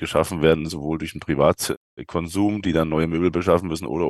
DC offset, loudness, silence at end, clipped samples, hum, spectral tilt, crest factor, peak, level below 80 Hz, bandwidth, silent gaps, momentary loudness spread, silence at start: under 0.1%; -22 LUFS; 0 s; under 0.1%; none; -6 dB/octave; 20 dB; -2 dBFS; -42 dBFS; 12.5 kHz; 1.77-1.97 s; 8 LU; 0 s